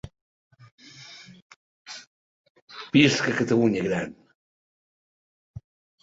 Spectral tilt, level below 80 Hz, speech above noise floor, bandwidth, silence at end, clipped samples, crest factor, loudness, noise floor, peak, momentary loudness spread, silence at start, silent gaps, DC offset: -5 dB/octave; -60 dBFS; 25 dB; 8 kHz; 0.45 s; under 0.1%; 26 dB; -22 LUFS; -47 dBFS; -2 dBFS; 28 LU; 0.05 s; 0.21-0.51 s, 0.72-0.78 s, 1.42-1.50 s, 1.56-1.85 s, 2.07-2.44 s, 2.50-2.55 s, 2.62-2.68 s, 4.35-5.54 s; under 0.1%